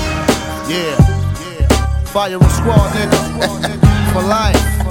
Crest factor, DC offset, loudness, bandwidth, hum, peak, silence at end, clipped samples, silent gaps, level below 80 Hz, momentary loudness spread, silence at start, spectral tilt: 14 dB; under 0.1%; -14 LUFS; 18 kHz; none; 0 dBFS; 0 s; 0.3%; none; -20 dBFS; 6 LU; 0 s; -5.5 dB/octave